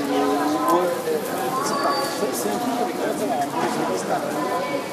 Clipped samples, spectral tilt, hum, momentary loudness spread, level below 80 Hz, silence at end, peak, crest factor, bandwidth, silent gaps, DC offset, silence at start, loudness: under 0.1%; -4 dB/octave; none; 4 LU; -68 dBFS; 0 s; -8 dBFS; 16 dB; 15.5 kHz; none; under 0.1%; 0 s; -23 LUFS